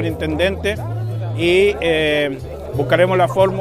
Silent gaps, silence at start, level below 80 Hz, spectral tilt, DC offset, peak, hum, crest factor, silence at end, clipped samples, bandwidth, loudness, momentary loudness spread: none; 0 s; -36 dBFS; -6 dB/octave; under 0.1%; 0 dBFS; none; 16 dB; 0 s; under 0.1%; 15 kHz; -17 LUFS; 10 LU